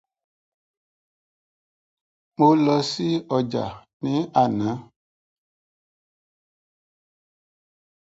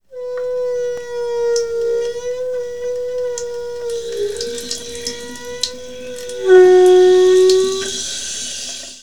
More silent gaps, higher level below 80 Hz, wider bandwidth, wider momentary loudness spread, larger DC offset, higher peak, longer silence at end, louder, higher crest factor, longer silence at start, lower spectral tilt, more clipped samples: first, 3.93-4.00 s vs none; second, -64 dBFS vs -50 dBFS; second, 7.8 kHz vs 12.5 kHz; about the same, 15 LU vs 16 LU; second, under 0.1% vs 1%; second, -4 dBFS vs 0 dBFS; first, 3.35 s vs 0 s; second, -22 LUFS vs -16 LUFS; first, 22 dB vs 16 dB; first, 2.4 s vs 0 s; first, -6.5 dB/octave vs -2.5 dB/octave; neither